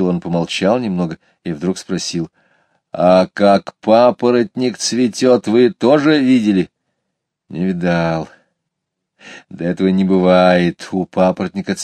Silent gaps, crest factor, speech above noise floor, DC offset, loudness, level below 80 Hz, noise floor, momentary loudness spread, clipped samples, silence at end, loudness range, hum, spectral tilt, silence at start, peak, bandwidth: none; 16 dB; 62 dB; under 0.1%; -15 LUFS; -54 dBFS; -77 dBFS; 12 LU; under 0.1%; 0 s; 6 LU; none; -6 dB/octave; 0 s; 0 dBFS; 10.5 kHz